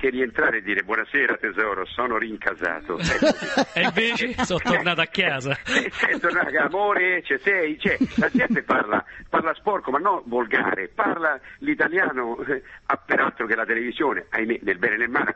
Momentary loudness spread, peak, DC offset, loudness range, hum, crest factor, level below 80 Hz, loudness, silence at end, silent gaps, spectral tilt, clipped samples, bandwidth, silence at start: 6 LU; -4 dBFS; under 0.1%; 2 LU; none; 18 dB; -52 dBFS; -22 LUFS; 0 s; none; -4.5 dB/octave; under 0.1%; 8.4 kHz; 0 s